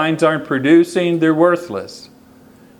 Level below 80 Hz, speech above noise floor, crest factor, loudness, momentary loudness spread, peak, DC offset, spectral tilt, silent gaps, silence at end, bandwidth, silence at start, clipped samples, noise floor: -62 dBFS; 30 dB; 16 dB; -15 LUFS; 15 LU; 0 dBFS; under 0.1%; -6.5 dB/octave; none; 0.75 s; 12 kHz; 0 s; under 0.1%; -45 dBFS